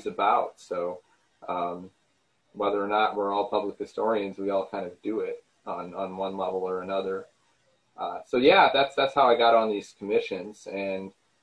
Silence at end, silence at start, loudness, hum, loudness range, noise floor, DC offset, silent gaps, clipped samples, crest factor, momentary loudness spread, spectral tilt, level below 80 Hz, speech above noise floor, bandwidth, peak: 0.35 s; 0 s; -27 LUFS; none; 9 LU; -71 dBFS; under 0.1%; none; under 0.1%; 22 dB; 16 LU; -5 dB/octave; -68 dBFS; 45 dB; 10.5 kHz; -6 dBFS